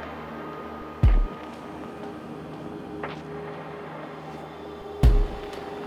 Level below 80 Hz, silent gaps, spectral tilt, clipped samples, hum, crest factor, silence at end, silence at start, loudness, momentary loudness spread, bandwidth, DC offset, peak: -28 dBFS; none; -7.5 dB/octave; under 0.1%; none; 20 dB; 0 s; 0 s; -31 LUFS; 15 LU; 11 kHz; under 0.1%; -6 dBFS